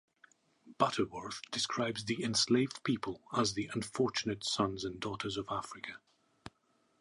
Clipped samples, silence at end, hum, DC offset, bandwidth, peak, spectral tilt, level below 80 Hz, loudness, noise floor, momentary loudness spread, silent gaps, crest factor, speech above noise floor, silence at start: under 0.1%; 0.5 s; none; under 0.1%; 11.5 kHz; -12 dBFS; -4 dB/octave; -66 dBFS; -35 LUFS; -74 dBFS; 15 LU; none; 24 dB; 39 dB; 0.65 s